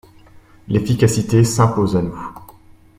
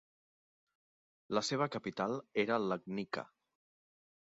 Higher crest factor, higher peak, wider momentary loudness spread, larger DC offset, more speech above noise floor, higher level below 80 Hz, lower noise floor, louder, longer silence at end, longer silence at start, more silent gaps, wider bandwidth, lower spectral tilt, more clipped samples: about the same, 18 dB vs 22 dB; first, 0 dBFS vs -18 dBFS; first, 13 LU vs 8 LU; neither; second, 29 dB vs over 54 dB; first, -44 dBFS vs -80 dBFS; second, -45 dBFS vs under -90 dBFS; first, -17 LUFS vs -37 LUFS; second, 0.55 s vs 1.1 s; second, 0.35 s vs 1.3 s; neither; first, 15.5 kHz vs 7.6 kHz; first, -6.5 dB/octave vs -4 dB/octave; neither